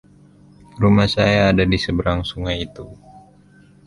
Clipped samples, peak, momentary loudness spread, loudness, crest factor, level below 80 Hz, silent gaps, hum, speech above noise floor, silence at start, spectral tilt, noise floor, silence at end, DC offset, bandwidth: under 0.1%; -2 dBFS; 15 LU; -18 LUFS; 18 dB; -36 dBFS; none; none; 32 dB; 0.75 s; -6.5 dB/octave; -49 dBFS; 0.95 s; under 0.1%; 11.5 kHz